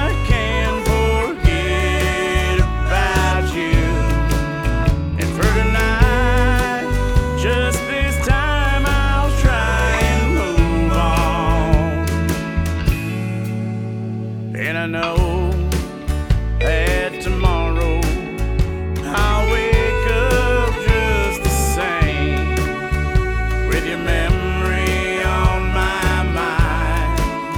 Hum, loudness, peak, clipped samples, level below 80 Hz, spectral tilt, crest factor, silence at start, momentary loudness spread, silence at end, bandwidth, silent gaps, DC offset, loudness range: none; -18 LUFS; 0 dBFS; under 0.1%; -20 dBFS; -5.5 dB/octave; 16 dB; 0 s; 5 LU; 0 s; 17 kHz; none; under 0.1%; 3 LU